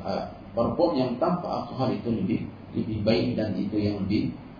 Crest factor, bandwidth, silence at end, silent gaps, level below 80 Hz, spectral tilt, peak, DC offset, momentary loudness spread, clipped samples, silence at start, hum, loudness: 18 dB; 5.2 kHz; 0 s; none; -52 dBFS; -9 dB/octave; -8 dBFS; under 0.1%; 8 LU; under 0.1%; 0 s; none; -27 LUFS